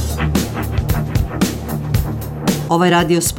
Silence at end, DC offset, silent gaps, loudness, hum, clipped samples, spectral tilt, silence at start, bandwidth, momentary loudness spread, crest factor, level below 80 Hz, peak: 0 s; under 0.1%; none; -18 LUFS; none; under 0.1%; -5 dB/octave; 0 s; 17.5 kHz; 7 LU; 16 dB; -26 dBFS; -2 dBFS